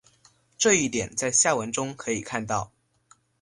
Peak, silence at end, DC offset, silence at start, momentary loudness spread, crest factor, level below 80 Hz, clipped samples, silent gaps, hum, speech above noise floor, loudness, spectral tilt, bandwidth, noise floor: -6 dBFS; 0.75 s; under 0.1%; 0.6 s; 10 LU; 20 dB; -58 dBFS; under 0.1%; none; none; 36 dB; -24 LUFS; -2.5 dB/octave; 11.5 kHz; -61 dBFS